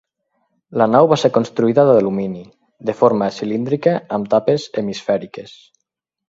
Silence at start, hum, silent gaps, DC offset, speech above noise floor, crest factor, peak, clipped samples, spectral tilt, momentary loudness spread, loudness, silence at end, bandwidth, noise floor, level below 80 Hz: 0.7 s; none; none; under 0.1%; 62 dB; 18 dB; 0 dBFS; under 0.1%; -7 dB/octave; 14 LU; -17 LUFS; 0.85 s; 7.8 kHz; -78 dBFS; -60 dBFS